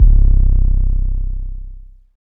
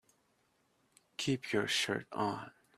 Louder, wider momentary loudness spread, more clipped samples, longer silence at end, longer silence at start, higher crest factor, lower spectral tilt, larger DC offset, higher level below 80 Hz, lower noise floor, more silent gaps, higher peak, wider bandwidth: first, -18 LUFS vs -35 LUFS; first, 19 LU vs 10 LU; neither; about the same, 0.15 s vs 0.25 s; second, 0 s vs 1.2 s; second, 12 dB vs 20 dB; first, -13 dB/octave vs -3.5 dB/octave; neither; first, -12 dBFS vs -76 dBFS; second, -34 dBFS vs -75 dBFS; neither; first, 0 dBFS vs -20 dBFS; second, 0.8 kHz vs 15 kHz